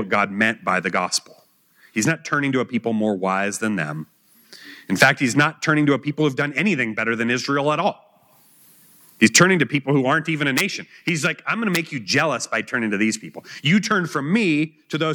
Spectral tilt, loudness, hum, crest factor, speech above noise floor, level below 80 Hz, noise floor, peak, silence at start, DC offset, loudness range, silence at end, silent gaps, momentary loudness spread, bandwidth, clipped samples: -4 dB/octave; -20 LUFS; none; 20 dB; 36 dB; -72 dBFS; -56 dBFS; 0 dBFS; 0 s; under 0.1%; 4 LU; 0 s; none; 9 LU; 19 kHz; under 0.1%